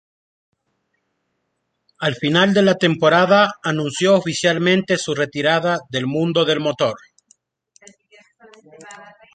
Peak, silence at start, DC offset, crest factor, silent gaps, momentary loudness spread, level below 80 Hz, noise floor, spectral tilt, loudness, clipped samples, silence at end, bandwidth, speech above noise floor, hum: -2 dBFS; 2 s; under 0.1%; 18 dB; none; 8 LU; -62 dBFS; -73 dBFS; -5 dB/octave; -17 LUFS; under 0.1%; 0.3 s; 9.4 kHz; 56 dB; none